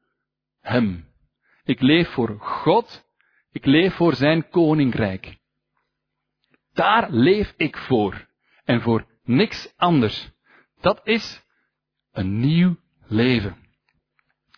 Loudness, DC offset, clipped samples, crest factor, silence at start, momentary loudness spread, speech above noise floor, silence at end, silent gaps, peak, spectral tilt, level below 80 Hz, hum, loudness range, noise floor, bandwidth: -20 LUFS; under 0.1%; under 0.1%; 18 dB; 0.65 s; 16 LU; 60 dB; 1.05 s; none; -4 dBFS; -7.5 dB/octave; -50 dBFS; none; 3 LU; -80 dBFS; 5.4 kHz